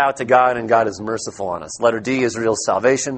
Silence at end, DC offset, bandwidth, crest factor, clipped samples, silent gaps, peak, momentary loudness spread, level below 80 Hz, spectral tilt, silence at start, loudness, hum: 0 s; under 0.1%; 8.8 kHz; 18 dB; under 0.1%; none; 0 dBFS; 10 LU; -56 dBFS; -4 dB/octave; 0 s; -18 LUFS; none